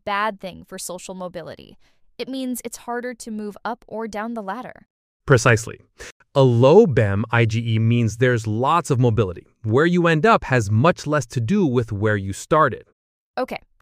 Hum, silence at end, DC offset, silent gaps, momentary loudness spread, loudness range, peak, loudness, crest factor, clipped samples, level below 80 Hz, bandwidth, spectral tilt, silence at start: none; 0.25 s; under 0.1%; 4.90-5.20 s, 6.12-6.20 s, 12.93-13.34 s; 17 LU; 12 LU; -2 dBFS; -19 LUFS; 18 dB; under 0.1%; -50 dBFS; 15 kHz; -6.5 dB/octave; 0.05 s